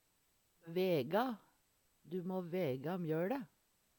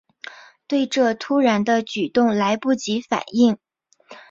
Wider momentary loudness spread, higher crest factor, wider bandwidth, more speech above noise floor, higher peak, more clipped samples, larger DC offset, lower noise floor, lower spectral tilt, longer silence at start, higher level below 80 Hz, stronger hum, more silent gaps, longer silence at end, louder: about the same, 10 LU vs 11 LU; about the same, 18 dB vs 16 dB; first, 19 kHz vs 7.6 kHz; first, 39 dB vs 29 dB; second, -24 dBFS vs -4 dBFS; neither; neither; first, -77 dBFS vs -48 dBFS; first, -7.5 dB/octave vs -5 dB/octave; first, 0.65 s vs 0.3 s; second, -84 dBFS vs -64 dBFS; neither; neither; first, 0.5 s vs 0.1 s; second, -39 LUFS vs -20 LUFS